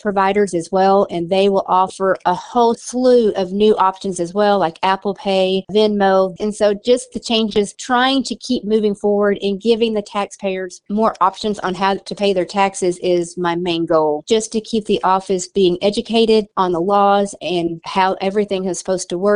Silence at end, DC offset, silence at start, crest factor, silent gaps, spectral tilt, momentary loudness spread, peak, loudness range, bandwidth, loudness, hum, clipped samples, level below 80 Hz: 0 s; under 0.1%; 0.05 s; 16 dB; none; -4.5 dB/octave; 7 LU; 0 dBFS; 3 LU; 11 kHz; -17 LUFS; none; under 0.1%; -52 dBFS